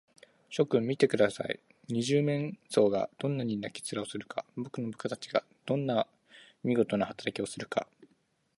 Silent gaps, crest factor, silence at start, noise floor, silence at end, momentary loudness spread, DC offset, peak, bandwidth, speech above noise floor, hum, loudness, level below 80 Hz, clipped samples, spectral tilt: none; 22 dB; 0.5 s; -72 dBFS; 0.55 s; 11 LU; under 0.1%; -10 dBFS; 11.5 kHz; 42 dB; none; -32 LUFS; -72 dBFS; under 0.1%; -5.5 dB/octave